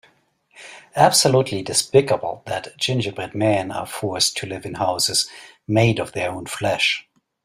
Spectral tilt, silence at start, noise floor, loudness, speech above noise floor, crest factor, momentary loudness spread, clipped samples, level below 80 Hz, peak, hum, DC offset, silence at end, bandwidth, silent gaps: -3.5 dB/octave; 0.55 s; -60 dBFS; -20 LUFS; 40 dB; 20 dB; 13 LU; under 0.1%; -56 dBFS; 0 dBFS; none; under 0.1%; 0.45 s; 16 kHz; none